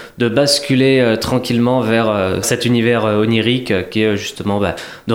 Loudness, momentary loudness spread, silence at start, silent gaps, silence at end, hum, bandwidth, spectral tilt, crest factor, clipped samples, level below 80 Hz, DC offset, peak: -15 LUFS; 6 LU; 0 s; none; 0 s; none; 16.5 kHz; -5 dB/octave; 14 dB; under 0.1%; -46 dBFS; under 0.1%; 0 dBFS